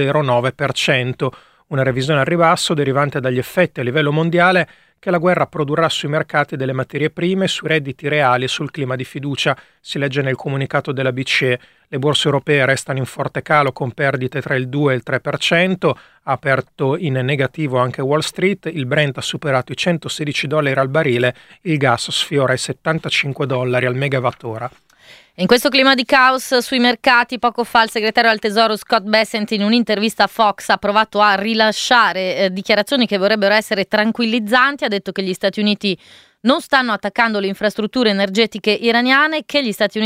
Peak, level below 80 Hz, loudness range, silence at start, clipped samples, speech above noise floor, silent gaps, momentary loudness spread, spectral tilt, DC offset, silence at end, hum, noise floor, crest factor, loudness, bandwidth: 0 dBFS; -56 dBFS; 4 LU; 0 s; under 0.1%; 29 dB; none; 8 LU; -5 dB/octave; under 0.1%; 0 s; none; -46 dBFS; 16 dB; -16 LUFS; 16 kHz